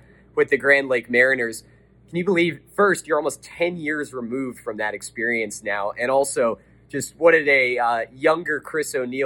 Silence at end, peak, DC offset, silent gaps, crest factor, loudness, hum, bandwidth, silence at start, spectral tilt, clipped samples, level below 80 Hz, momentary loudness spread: 0 s; -4 dBFS; under 0.1%; none; 18 dB; -21 LUFS; none; 17.5 kHz; 0.35 s; -4 dB/octave; under 0.1%; -60 dBFS; 12 LU